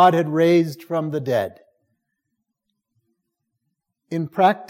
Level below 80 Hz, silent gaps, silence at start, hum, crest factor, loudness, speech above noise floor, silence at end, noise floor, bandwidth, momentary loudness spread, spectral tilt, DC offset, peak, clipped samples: -74 dBFS; none; 0 s; none; 18 dB; -20 LUFS; 59 dB; 0.05 s; -78 dBFS; 16 kHz; 12 LU; -7 dB/octave; under 0.1%; -4 dBFS; under 0.1%